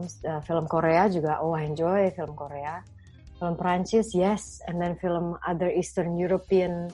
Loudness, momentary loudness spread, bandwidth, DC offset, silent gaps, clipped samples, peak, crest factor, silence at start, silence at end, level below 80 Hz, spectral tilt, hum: -27 LUFS; 11 LU; 11.5 kHz; under 0.1%; none; under 0.1%; -10 dBFS; 18 dB; 0 s; 0 s; -52 dBFS; -6.5 dB/octave; none